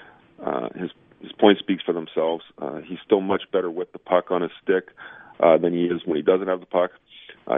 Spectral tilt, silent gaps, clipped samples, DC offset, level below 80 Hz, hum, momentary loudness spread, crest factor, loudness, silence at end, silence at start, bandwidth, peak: -9 dB/octave; none; under 0.1%; under 0.1%; -68 dBFS; none; 16 LU; 22 dB; -23 LUFS; 0 s; 0.4 s; 3.9 kHz; 0 dBFS